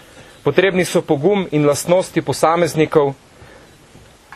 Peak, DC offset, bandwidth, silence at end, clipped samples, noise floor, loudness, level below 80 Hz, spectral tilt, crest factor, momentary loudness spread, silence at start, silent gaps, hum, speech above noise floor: 0 dBFS; under 0.1%; 13.5 kHz; 0 s; under 0.1%; -45 dBFS; -16 LUFS; -52 dBFS; -5.5 dB/octave; 18 dB; 6 LU; 0.15 s; none; none; 29 dB